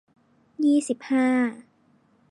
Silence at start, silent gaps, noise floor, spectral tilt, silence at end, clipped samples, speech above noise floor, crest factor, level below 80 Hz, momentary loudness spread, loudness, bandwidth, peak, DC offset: 0.6 s; none; -62 dBFS; -4 dB/octave; 0.7 s; under 0.1%; 40 dB; 12 dB; -80 dBFS; 4 LU; -23 LUFS; 11.5 kHz; -12 dBFS; under 0.1%